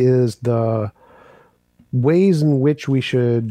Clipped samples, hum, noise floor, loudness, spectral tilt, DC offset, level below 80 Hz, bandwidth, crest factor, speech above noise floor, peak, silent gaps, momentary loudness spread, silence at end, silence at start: under 0.1%; none; -55 dBFS; -18 LUFS; -8 dB/octave; under 0.1%; -60 dBFS; 11 kHz; 12 dB; 39 dB; -6 dBFS; none; 8 LU; 0 s; 0 s